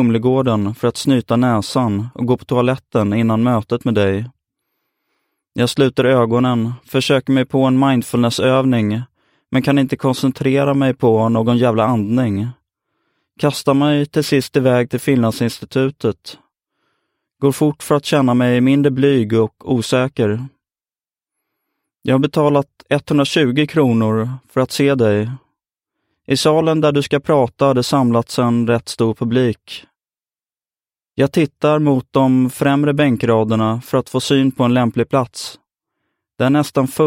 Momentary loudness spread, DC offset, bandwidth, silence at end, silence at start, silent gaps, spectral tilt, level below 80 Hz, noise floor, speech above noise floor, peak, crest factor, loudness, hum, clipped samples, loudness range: 7 LU; under 0.1%; 16.5 kHz; 0 s; 0 s; none; -6.5 dB/octave; -54 dBFS; under -90 dBFS; over 75 dB; 0 dBFS; 16 dB; -16 LUFS; none; under 0.1%; 4 LU